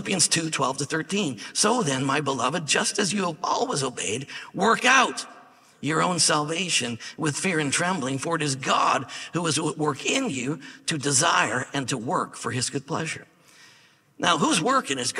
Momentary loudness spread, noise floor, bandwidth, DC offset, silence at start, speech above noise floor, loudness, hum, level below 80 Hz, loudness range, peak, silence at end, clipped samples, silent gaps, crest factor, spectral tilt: 9 LU; -57 dBFS; 15.5 kHz; under 0.1%; 0 s; 32 dB; -24 LUFS; none; -68 dBFS; 3 LU; -4 dBFS; 0 s; under 0.1%; none; 22 dB; -3 dB/octave